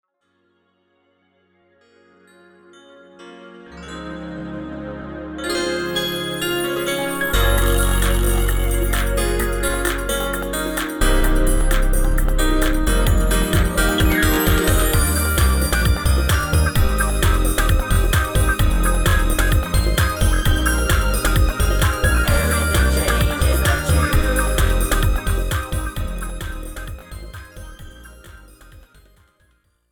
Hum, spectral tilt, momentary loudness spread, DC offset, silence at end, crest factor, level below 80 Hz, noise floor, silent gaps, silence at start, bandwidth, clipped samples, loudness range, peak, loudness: none; -4.5 dB/octave; 14 LU; under 0.1%; 1.15 s; 14 dB; -20 dBFS; -66 dBFS; none; 3.2 s; over 20 kHz; under 0.1%; 14 LU; -4 dBFS; -19 LUFS